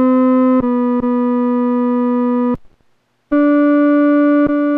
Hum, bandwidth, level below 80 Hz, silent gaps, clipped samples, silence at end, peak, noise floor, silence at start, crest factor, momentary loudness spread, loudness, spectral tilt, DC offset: none; 4.1 kHz; -48 dBFS; none; under 0.1%; 0 s; -6 dBFS; -59 dBFS; 0 s; 8 dB; 4 LU; -14 LUFS; -9.5 dB/octave; under 0.1%